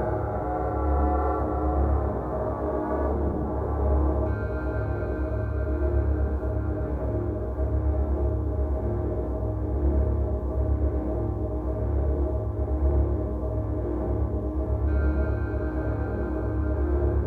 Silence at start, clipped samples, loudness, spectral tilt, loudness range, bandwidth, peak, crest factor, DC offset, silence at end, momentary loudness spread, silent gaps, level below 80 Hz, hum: 0 s; under 0.1%; -27 LUFS; -11.5 dB/octave; 1 LU; 2.6 kHz; -12 dBFS; 12 dB; under 0.1%; 0 s; 4 LU; none; -28 dBFS; none